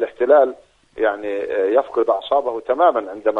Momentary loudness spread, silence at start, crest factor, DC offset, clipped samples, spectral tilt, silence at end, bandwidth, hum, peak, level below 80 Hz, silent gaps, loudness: 8 LU; 0 s; 16 dB; under 0.1%; under 0.1%; -5.5 dB/octave; 0 s; 4.4 kHz; none; -2 dBFS; -60 dBFS; none; -18 LUFS